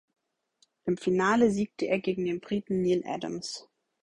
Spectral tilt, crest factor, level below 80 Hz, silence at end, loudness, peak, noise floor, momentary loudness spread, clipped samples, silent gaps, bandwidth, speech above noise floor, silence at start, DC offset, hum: -6 dB/octave; 18 dB; -64 dBFS; 0.4 s; -29 LUFS; -10 dBFS; -70 dBFS; 12 LU; under 0.1%; none; 11 kHz; 42 dB; 0.85 s; under 0.1%; none